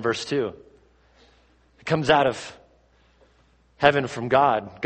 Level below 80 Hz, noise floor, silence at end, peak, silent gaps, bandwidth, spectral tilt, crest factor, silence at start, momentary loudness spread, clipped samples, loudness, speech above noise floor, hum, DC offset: -56 dBFS; -60 dBFS; 0 s; 0 dBFS; none; 8.8 kHz; -5 dB/octave; 24 dB; 0 s; 15 LU; under 0.1%; -22 LUFS; 38 dB; none; under 0.1%